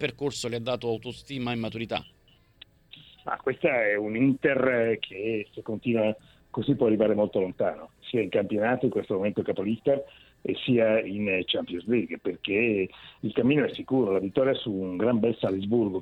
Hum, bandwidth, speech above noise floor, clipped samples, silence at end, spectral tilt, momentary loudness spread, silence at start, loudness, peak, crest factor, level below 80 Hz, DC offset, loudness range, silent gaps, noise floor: none; 11 kHz; 29 dB; under 0.1%; 0 s; -6.5 dB/octave; 10 LU; 0 s; -27 LUFS; -10 dBFS; 16 dB; -62 dBFS; under 0.1%; 3 LU; none; -55 dBFS